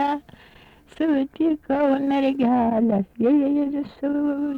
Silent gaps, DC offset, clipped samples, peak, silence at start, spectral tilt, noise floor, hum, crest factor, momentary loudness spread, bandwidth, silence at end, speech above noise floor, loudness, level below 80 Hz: none; under 0.1%; under 0.1%; -10 dBFS; 0 s; -8.5 dB/octave; -50 dBFS; none; 12 dB; 7 LU; 5 kHz; 0 s; 29 dB; -22 LUFS; -56 dBFS